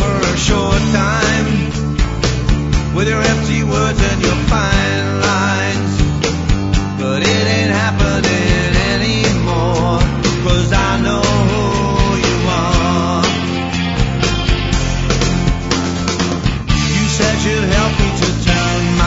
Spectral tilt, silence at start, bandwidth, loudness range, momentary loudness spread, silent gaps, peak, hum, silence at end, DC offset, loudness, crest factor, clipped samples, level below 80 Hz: -5 dB/octave; 0 s; 8 kHz; 1 LU; 3 LU; none; 0 dBFS; none; 0 s; under 0.1%; -15 LUFS; 14 dB; under 0.1%; -22 dBFS